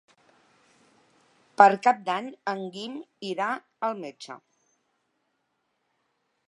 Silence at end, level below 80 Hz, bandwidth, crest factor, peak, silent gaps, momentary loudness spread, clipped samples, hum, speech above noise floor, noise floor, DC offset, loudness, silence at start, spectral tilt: 2.1 s; -82 dBFS; 11 kHz; 28 dB; -2 dBFS; none; 24 LU; under 0.1%; none; 51 dB; -76 dBFS; under 0.1%; -25 LUFS; 1.6 s; -4.5 dB/octave